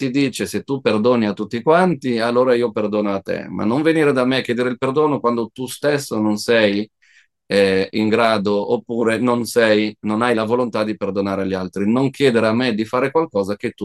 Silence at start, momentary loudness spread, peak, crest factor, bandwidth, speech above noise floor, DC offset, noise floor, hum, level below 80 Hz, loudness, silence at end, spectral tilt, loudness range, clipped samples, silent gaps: 0 s; 7 LU; 0 dBFS; 18 dB; 12.5 kHz; 38 dB; under 0.1%; -55 dBFS; none; -62 dBFS; -18 LUFS; 0 s; -5.5 dB/octave; 1 LU; under 0.1%; none